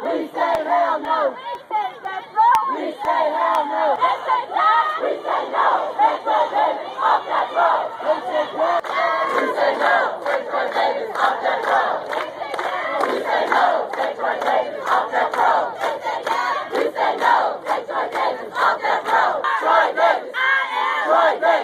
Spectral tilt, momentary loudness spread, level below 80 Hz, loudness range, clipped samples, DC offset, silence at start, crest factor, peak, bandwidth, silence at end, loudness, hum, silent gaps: -3 dB/octave; 7 LU; -68 dBFS; 2 LU; under 0.1%; under 0.1%; 0 s; 18 dB; -2 dBFS; 14 kHz; 0 s; -19 LUFS; none; none